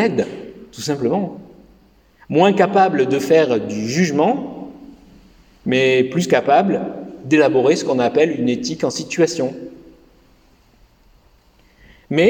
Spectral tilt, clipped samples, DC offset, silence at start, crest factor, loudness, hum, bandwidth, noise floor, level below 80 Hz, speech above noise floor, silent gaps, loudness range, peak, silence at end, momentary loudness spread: -5.5 dB/octave; under 0.1%; under 0.1%; 0 s; 18 dB; -17 LUFS; none; 17.5 kHz; -53 dBFS; -56 dBFS; 37 dB; none; 7 LU; -2 dBFS; 0 s; 16 LU